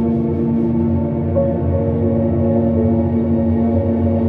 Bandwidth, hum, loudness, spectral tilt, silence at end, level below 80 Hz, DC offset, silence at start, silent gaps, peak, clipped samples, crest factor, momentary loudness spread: 3.3 kHz; none; -17 LUFS; -13 dB/octave; 0 s; -34 dBFS; under 0.1%; 0 s; none; -4 dBFS; under 0.1%; 12 dB; 2 LU